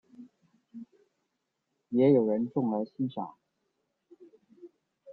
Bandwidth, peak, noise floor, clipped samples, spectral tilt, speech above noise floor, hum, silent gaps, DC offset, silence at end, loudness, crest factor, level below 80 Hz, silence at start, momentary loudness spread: 4.5 kHz; -12 dBFS; -82 dBFS; under 0.1%; -11 dB/octave; 55 dB; none; none; under 0.1%; 0 s; -28 LUFS; 20 dB; -76 dBFS; 0.2 s; 26 LU